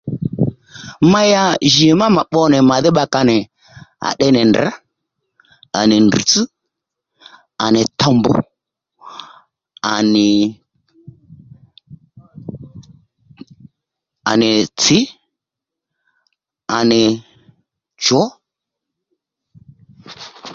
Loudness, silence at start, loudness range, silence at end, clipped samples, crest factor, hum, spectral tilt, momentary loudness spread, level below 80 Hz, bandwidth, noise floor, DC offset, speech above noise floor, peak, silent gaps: -14 LUFS; 0.05 s; 8 LU; 0 s; under 0.1%; 16 dB; none; -4.5 dB/octave; 22 LU; -52 dBFS; 7.6 kHz; -84 dBFS; under 0.1%; 71 dB; 0 dBFS; none